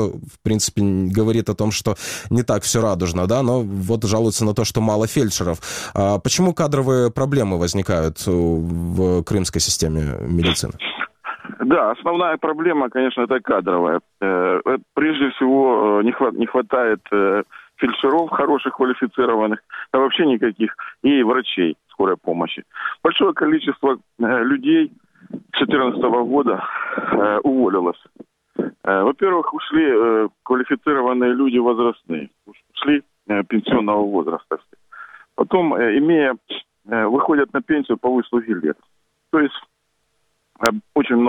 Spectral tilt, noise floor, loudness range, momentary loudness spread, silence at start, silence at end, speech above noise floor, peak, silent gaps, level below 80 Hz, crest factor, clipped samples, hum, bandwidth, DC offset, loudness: -5 dB/octave; -69 dBFS; 2 LU; 8 LU; 0 s; 0 s; 51 dB; 0 dBFS; none; -44 dBFS; 18 dB; under 0.1%; none; 16 kHz; under 0.1%; -19 LUFS